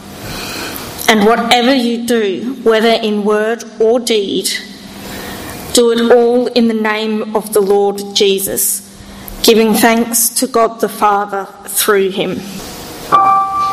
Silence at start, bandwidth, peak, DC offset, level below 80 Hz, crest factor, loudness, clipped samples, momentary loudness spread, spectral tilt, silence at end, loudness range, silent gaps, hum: 0 s; 15.5 kHz; 0 dBFS; under 0.1%; -44 dBFS; 14 dB; -12 LUFS; under 0.1%; 16 LU; -3 dB/octave; 0 s; 2 LU; none; none